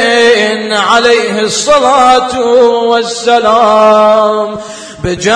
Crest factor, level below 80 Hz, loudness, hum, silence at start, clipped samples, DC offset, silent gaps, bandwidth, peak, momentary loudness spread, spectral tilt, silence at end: 8 dB; -40 dBFS; -8 LUFS; none; 0 s; 0.6%; under 0.1%; none; 10.5 kHz; 0 dBFS; 9 LU; -3 dB/octave; 0 s